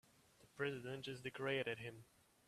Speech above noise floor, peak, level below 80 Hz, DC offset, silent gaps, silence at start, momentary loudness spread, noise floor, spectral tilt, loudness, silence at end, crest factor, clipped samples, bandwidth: 25 dB; -26 dBFS; -80 dBFS; under 0.1%; none; 0.4 s; 15 LU; -71 dBFS; -5 dB/octave; -45 LUFS; 0.45 s; 22 dB; under 0.1%; 14 kHz